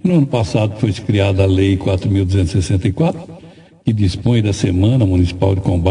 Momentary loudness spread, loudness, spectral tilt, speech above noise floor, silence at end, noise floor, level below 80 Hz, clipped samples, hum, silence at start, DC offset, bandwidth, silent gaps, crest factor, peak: 5 LU; -16 LUFS; -7.5 dB/octave; 27 dB; 0 s; -41 dBFS; -38 dBFS; under 0.1%; none; 0.05 s; under 0.1%; 10.5 kHz; none; 14 dB; -2 dBFS